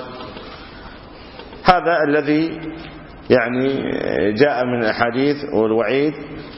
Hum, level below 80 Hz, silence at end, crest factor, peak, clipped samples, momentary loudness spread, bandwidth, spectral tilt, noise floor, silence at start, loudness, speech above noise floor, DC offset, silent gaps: none; -44 dBFS; 0 s; 20 dB; 0 dBFS; under 0.1%; 21 LU; 5.8 kHz; -8 dB/octave; -38 dBFS; 0 s; -18 LUFS; 20 dB; under 0.1%; none